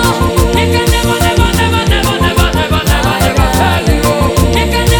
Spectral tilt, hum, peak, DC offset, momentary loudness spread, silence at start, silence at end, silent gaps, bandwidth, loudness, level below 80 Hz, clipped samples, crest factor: -5 dB/octave; none; 0 dBFS; under 0.1%; 1 LU; 0 s; 0 s; none; over 20 kHz; -11 LUFS; -18 dBFS; 0.4%; 10 dB